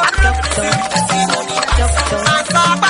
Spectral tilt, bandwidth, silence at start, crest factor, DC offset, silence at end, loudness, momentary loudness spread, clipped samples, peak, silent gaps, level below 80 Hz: -3 dB/octave; 11 kHz; 0 s; 14 dB; under 0.1%; 0 s; -14 LUFS; 3 LU; under 0.1%; 0 dBFS; none; -20 dBFS